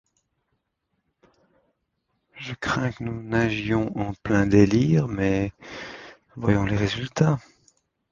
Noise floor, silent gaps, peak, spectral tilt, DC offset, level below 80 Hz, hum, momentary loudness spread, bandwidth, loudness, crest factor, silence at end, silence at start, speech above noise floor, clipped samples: -76 dBFS; none; -4 dBFS; -7 dB/octave; under 0.1%; -46 dBFS; none; 19 LU; 7.4 kHz; -23 LUFS; 22 dB; 0.75 s; 2.35 s; 54 dB; under 0.1%